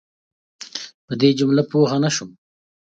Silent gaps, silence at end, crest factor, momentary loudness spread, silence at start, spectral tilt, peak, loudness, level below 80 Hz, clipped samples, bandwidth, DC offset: 0.94-1.08 s; 0.6 s; 18 dB; 16 LU; 0.6 s; -5.5 dB/octave; -2 dBFS; -19 LUFS; -66 dBFS; under 0.1%; 8.8 kHz; under 0.1%